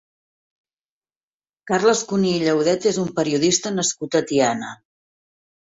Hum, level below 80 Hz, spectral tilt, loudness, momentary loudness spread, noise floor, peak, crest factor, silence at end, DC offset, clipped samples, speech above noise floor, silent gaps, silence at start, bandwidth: none; -62 dBFS; -4 dB/octave; -20 LUFS; 5 LU; under -90 dBFS; -4 dBFS; 18 dB; 0.95 s; under 0.1%; under 0.1%; over 70 dB; none; 1.65 s; 8 kHz